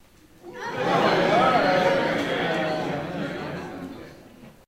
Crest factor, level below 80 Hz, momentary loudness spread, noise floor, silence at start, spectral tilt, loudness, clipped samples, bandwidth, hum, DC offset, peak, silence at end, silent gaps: 18 dB; -56 dBFS; 17 LU; -47 dBFS; 0.45 s; -5.5 dB/octave; -23 LUFS; under 0.1%; 16 kHz; none; under 0.1%; -8 dBFS; 0.15 s; none